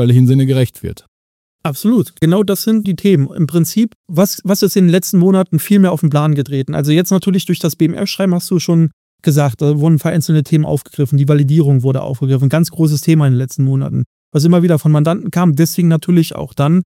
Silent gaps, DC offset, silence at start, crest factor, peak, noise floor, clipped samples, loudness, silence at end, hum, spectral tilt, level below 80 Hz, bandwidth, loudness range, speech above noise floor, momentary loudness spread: 1.08-1.59 s, 3.95-4.04 s, 8.93-9.18 s, 14.06-14.32 s; under 0.1%; 0 s; 12 dB; 0 dBFS; under -90 dBFS; under 0.1%; -13 LUFS; 0.05 s; none; -7 dB/octave; -50 dBFS; 17 kHz; 2 LU; over 78 dB; 6 LU